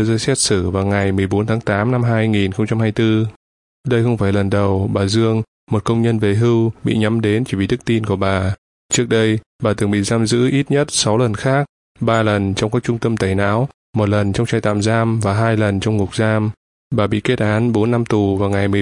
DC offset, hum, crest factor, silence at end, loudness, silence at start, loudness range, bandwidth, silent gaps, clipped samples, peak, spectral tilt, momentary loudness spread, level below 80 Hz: under 0.1%; none; 16 dB; 0 s; -17 LUFS; 0 s; 1 LU; 11.5 kHz; 3.36-3.84 s, 5.48-5.67 s, 8.58-8.89 s, 9.46-9.59 s, 11.69-11.95 s, 13.74-13.93 s, 16.57-16.90 s; under 0.1%; 0 dBFS; -5.5 dB/octave; 4 LU; -46 dBFS